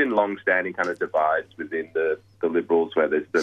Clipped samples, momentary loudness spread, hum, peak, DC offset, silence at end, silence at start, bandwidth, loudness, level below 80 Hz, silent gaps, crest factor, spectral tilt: under 0.1%; 6 LU; none; -6 dBFS; under 0.1%; 0 s; 0 s; 7.8 kHz; -24 LUFS; -70 dBFS; none; 16 dB; -5.5 dB/octave